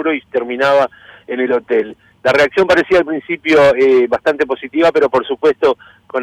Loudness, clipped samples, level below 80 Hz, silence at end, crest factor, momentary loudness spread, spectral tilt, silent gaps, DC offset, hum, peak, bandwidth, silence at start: -14 LUFS; under 0.1%; -50 dBFS; 0 s; 10 dB; 10 LU; -5 dB/octave; none; under 0.1%; none; -4 dBFS; 11 kHz; 0 s